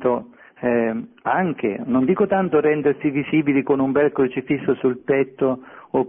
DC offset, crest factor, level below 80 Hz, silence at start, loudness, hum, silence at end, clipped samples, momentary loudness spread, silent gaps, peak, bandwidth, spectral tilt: under 0.1%; 14 dB; -58 dBFS; 0 s; -21 LUFS; none; 0 s; under 0.1%; 7 LU; none; -6 dBFS; 3.7 kHz; -12 dB/octave